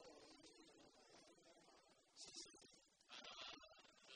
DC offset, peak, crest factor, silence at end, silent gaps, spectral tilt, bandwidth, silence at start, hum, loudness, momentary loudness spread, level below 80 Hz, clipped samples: under 0.1%; -42 dBFS; 22 dB; 0 s; none; -0.5 dB/octave; 10 kHz; 0 s; none; -61 LUFS; 13 LU; -90 dBFS; under 0.1%